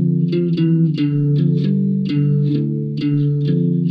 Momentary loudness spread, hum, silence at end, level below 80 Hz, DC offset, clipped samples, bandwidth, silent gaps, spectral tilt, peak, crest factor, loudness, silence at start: 3 LU; none; 0 s; -58 dBFS; under 0.1%; under 0.1%; 5.2 kHz; none; -11 dB/octave; -6 dBFS; 10 dB; -17 LUFS; 0 s